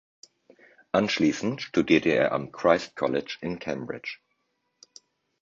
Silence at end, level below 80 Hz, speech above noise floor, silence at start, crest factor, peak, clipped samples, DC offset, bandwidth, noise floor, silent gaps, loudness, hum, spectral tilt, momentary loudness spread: 1.3 s; -62 dBFS; 50 dB; 0.95 s; 22 dB; -6 dBFS; under 0.1%; under 0.1%; 7.6 kHz; -76 dBFS; none; -26 LUFS; none; -5.5 dB/octave; 13 LU